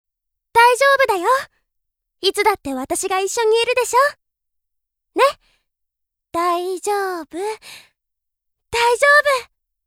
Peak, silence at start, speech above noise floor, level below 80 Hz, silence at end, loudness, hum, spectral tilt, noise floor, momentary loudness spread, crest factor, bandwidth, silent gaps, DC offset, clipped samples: 0 dBFS; 0.55 s; 62 dB; -56 dBFS; 0.45 s; -17 LUFS; none; -1 dB/octave; -80 dBFS; 14 LU; 20 dB; 17 kHz; none; under 0.1%; under 0.1%